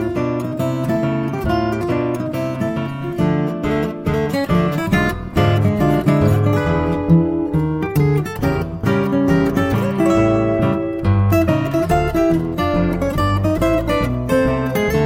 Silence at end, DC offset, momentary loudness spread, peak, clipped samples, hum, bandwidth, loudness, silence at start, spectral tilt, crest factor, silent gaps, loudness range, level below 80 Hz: 0 s; under 0.1%; 6 LU; -2 dBFS; under 0.1%; none; 17 kHz; -18 LUFS; 0 s; -7.5 dB/octave; 14 dB; none; 4 LU; -32 dBFS